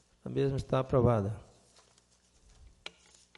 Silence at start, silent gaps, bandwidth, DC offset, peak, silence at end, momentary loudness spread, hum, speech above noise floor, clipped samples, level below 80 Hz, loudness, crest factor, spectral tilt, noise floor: 0.25 s; none; 11.5 kHz; under 0.1%; -14 dBFS; 2 s; 21 LU; 60 Hz at -55 dBFS; 38 dB; under 0.1%; -54 dBFS; -31 LUFS; 20 dB; -8 dB/octave; -67 dBFS